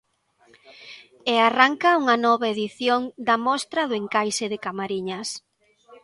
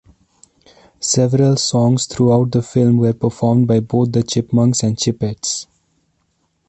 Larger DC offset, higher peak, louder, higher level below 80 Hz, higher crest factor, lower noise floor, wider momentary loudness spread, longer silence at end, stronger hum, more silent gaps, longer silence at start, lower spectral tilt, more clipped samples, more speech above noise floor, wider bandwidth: neither; about the same, 0 dBFS vs -2 dBFS; second, -22 LUFS vs -16 LUFS; second, -72 dBFS vs -48 dBFS; first, 22 dB vs 14 dB; second, -61 dBFS vs -65 dBFS; first, 14 LU vs 7 LU; second, 0.1 s vs 1.05 s; neither; neither; second, 0.7 s vs 1 s; second, -3 dB/octave vs -6 dB/octave; neither; second, 39 dB vs 50 dB; first, 11.5 kHz vs 8.8 kHz